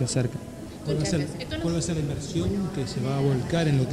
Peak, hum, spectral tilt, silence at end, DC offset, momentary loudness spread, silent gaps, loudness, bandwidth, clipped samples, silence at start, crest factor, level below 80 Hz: -12 dBFS; none; -6 dB/octave; 0 s; under 0.1%; 7 LU; none; -27 LUFS; 13.5 kHz; under 0.1%; 0 s; 14 dB; -44 dBFS